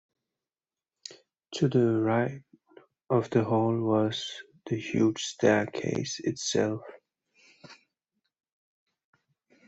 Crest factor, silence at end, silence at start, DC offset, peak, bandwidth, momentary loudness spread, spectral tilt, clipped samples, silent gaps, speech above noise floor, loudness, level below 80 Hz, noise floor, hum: 22 dB; 1.95 s; 1.1 s; under 0.1%; -10 dBFS; 8.2 kHz; 17 LU; -5.5 dB/octave; under 0.1%; none; over 63 dB; -28 LUFS; -68 dBFS; under -90 dBFS; none